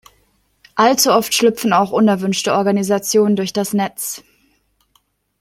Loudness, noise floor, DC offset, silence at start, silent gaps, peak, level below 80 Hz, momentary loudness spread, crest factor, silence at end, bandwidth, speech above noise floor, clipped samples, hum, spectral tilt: -16 LUFS; -62 dBFS; under 0.1%; 0.75 s; none; 0 dBFS; -60 dBFS; 10 LU; 16 dB; 1.2 s; 16.5 kHz; 46 dB; under 0.1%; none; -4 dB/octave